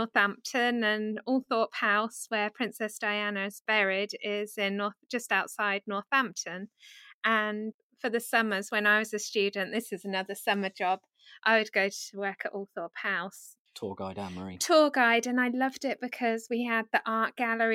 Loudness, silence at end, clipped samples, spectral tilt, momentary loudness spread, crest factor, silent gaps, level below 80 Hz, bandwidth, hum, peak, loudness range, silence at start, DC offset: -29 LUFS; 0 s; under 0.1%; -3 dB/octave; 12 LU; 20 dB; 3.61-3.65 s, 7.14-7.21 s, 7.74-7.90 s, 13.59-13.65 s; -80 dBFS; 16.5 kHz; none; -10 dBFS; 3 LU; 0 s; under 0.1%